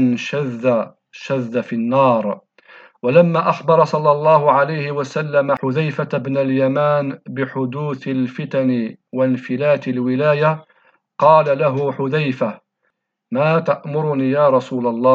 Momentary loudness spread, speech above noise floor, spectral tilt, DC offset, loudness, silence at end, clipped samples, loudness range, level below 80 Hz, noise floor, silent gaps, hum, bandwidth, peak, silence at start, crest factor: 11 LU; 54 dB; -8 dB/octave; under 0.1%; -17 LUFS; 0 s; under 0.1%; 4 LU; -74 dBFS; -70 dBFS; none; none; 7.4 kHz; 0 dBFS; 0 s; 18 dB